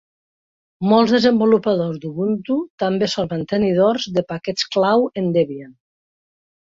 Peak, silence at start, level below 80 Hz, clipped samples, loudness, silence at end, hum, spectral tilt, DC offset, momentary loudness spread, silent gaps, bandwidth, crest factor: -2 dBFS; 0.8 s; -58 dBFS; under 0.1%; -18 LUFS; 0.95 s; none; -6 dB/octave; under 0.1%; 9 LU; 2.70-2.78 s; 7.6 kHz; 18 dB